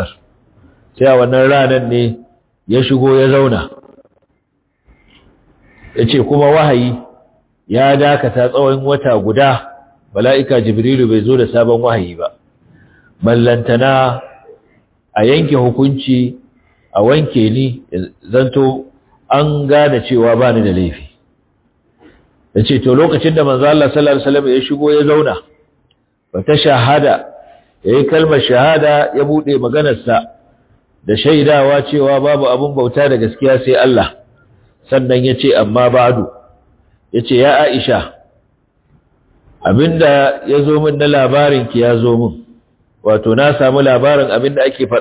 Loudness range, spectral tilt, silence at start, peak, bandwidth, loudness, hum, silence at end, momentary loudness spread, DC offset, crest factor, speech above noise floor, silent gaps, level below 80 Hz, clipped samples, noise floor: 4 LU; -11 dB/octave; 0 s; 0 dBFS; 4 kHz; -11 LUFS; none; 0 s; 10 LU; under 0.1%; 12 dB; 53 dB; none; -42 dBFS; under 0.1%; -63 dBFS